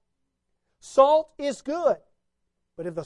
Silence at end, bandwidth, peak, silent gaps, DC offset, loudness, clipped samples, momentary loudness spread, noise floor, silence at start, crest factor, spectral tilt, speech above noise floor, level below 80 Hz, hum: 0 s; 11 kHz; -6 dBFS; none; under 0.1%; -23 LUFS; under 0.1%; 14 LU; -76 dBFS; 0.85 s; 22 dB; -5 dB/octave; 54 dB; -66 dBFS; none